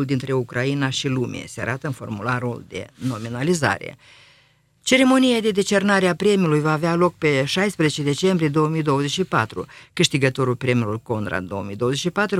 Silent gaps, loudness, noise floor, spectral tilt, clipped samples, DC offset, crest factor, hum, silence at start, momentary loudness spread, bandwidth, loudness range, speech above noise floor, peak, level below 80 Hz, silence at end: none; -21 LUFS; -58 dBFS; -5 dB/octave; under 0.1%; under 0.1%; 18 dB; none; 0 s; 11 LU; 15.5 kHz; 7 LU; 37 dB; -2 dBFS; -56 dBFS; 0 s